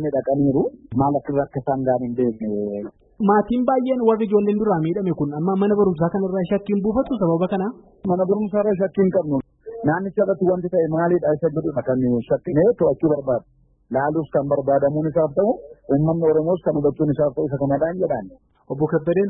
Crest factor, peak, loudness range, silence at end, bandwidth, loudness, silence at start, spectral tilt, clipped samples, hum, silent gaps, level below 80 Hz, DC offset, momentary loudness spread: 16 dB; -4 dBFS; 2 LU; 0 s; 4 kHz; -21 LUFS; 0 s; -13.5 dB/octave; under 0.1%; none; none; -50 dBFS; under 0.1%; 7 LU